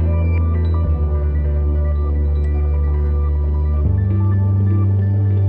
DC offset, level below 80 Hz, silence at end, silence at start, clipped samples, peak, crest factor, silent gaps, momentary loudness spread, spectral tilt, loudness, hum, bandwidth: under 0.1%; -18 dBFS; 0 s; 0 s; under 0.1%; -8 dBFS; 8 dB; none; 3 LU; -12 dB/octave; -18 LUFS; none; 2.5 kHz